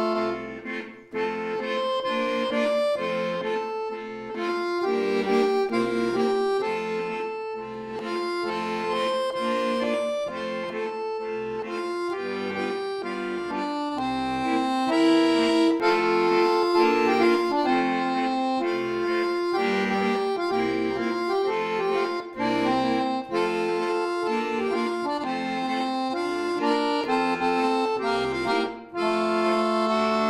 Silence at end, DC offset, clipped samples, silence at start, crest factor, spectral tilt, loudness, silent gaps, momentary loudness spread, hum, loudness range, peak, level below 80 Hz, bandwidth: 0 s; under 0.1%; under 0.1%; 0 s; 16 dB; -5 dB/octave; -25 LUFS; none; 9 LU; none; 6 LU; -10 dBFS; -62 dBFS; 12.5 kHz